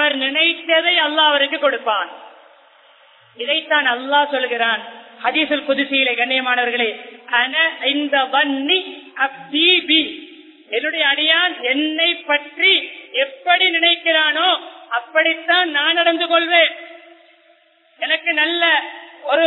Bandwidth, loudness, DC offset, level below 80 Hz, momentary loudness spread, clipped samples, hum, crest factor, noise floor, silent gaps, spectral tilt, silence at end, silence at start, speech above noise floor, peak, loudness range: 4.2 kHz; -16 LUFS; under 0.1%; -72 dBFS; 9 LU; under 0.1%; none; 18 dB; -54 dBFS; none; -3.5 dB/octave; 0 s; 0 s; 37 dB; 0 dBFS; 3 LU